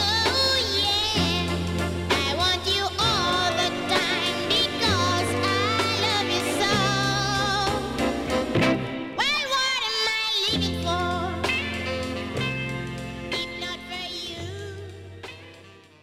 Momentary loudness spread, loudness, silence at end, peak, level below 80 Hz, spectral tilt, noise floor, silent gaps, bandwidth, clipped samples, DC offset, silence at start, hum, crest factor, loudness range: 11 LU; -23 LUFS; 0.25 s; -8 dBFS; -44 dBFS; -3.5 dB/octave; -49 dBFS; none; 16.5 kHz; under 0.1%; under 0.1%; 0 s; none; 18 dB; 8 LU